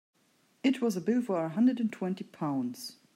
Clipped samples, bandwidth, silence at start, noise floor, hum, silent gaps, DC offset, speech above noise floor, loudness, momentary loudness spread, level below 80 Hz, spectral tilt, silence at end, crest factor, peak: under 0.1%; 14.5 kHz; 0.65 s; -69 dBFS; none; none; under 0.1%; 39 dB; -31 LUFS; 9 LU; -84 dBFS; -6.5 dB/octave; 0.25 s; 16 dB; -16 dBFS